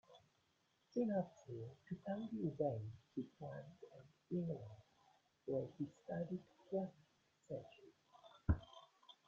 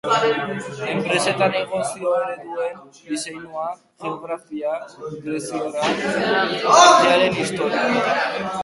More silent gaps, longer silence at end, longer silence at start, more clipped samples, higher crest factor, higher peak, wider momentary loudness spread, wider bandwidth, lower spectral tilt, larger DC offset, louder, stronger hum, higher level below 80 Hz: neither; first, 0.15 s vs 0 s; about the same, 0.1 s vs 0.05 s; neither; about the same, 24 dB vs 20 dB; second, -24 dBFS vs 0 dBFS; first, 21 LU vs 16 LU; second, 7.6 kHz vs 11.5 kHz; first, -8.5 dB/octave vs -3 dB/octave; neither; second, -46 LUFS vs -20 LUFS; neither; about the same, -60 dBFS vs -60 dBFS